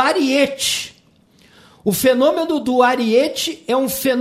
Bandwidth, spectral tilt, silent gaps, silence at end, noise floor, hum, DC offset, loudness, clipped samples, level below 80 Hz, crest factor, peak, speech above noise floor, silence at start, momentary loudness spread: 16 kHz; -3 dB/octave; none; 0 s; -53 dBFS; none; under 0.1%; -17 LUFS; under 0.1%; -56 dBFS; 16 dB; -2 dBFS; 36 dB; 0 s; 8 LU